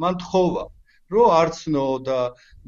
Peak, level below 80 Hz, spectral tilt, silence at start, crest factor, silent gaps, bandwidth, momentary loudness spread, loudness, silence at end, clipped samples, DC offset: -4 dBFS; -48 dBFS; -6.5 dB/octave; 0 s; 16 dB; none; 7.6 kHz; 12 LU; -21 LUFS; 0.35 s; under 0.1%; under 0.1%